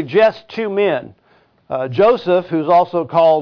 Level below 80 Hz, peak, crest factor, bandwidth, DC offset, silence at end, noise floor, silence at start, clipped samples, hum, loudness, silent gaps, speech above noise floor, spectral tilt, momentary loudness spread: -58 dBFS; -4 dBFS; 12 dB; 5.4 kHz; under 0.1%; 0 s; -55 dBFS; 0 s; under 0.1%; none; -16 LUFS; none; 40 dB; -8 dB/octave; 10 LU